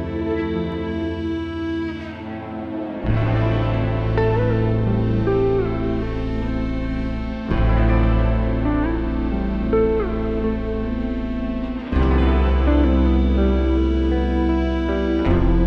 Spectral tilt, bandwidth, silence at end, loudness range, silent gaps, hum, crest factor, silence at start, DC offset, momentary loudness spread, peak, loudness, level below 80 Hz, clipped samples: -9.5 dB/octave; 5.8 kHz; 0 s; 4 LU; none; none; 14 dB; 0 s; under 0.1%; 8 LU; -6 dBFS; -21 LUFS; -24 dBFS; under 0.1%